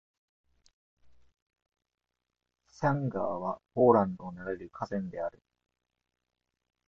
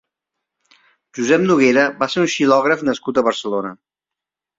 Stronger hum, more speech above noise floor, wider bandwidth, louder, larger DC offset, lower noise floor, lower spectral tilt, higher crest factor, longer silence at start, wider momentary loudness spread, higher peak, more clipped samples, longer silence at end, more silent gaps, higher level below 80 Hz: neither; second, 58 dB vs 70 dB; about the same, 7.2 kHz vs 7.8 kHz; second, -31 LUFS vs -16 LUFS; neither; about the same, -88 dBFS vs -86 dBFS; first, -9 dB/octave vs -4.5 dB/octave; first, 26 dB vs 16 dB; about the same, 1.05 s vs 1.15 s; first, 15 LU vs 11 LU; second, -8 dBFS vs -2 dBFS; neither; first, 1.6 s vs 0.85 s; first, 1.42-1.46 s vs none; about the same, -66 dBFS vs -62 dBFS